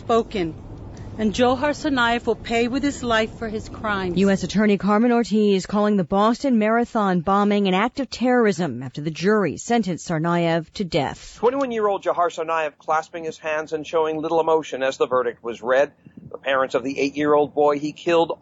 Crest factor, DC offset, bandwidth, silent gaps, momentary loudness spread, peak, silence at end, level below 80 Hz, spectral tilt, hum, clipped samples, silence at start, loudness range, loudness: 14 dB; under 0.1%; 8 kHz; none; 8 LU; -8 dBFS; 0.05 s; -48 dBFS; -5.5 dB/octave; none; under 0.1%; 0 s; 4 LU; -21 LUFS